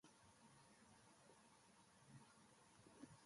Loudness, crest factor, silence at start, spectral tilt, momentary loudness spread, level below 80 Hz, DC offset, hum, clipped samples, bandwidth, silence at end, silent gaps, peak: -69 LUFS; 22 dB; 0.05 s; -4 dB/octave; 4 LU; -90 dBFS; under 0.1%; none; under 0.1%; 11.5 kHz; 0 s; none; -48 dBFS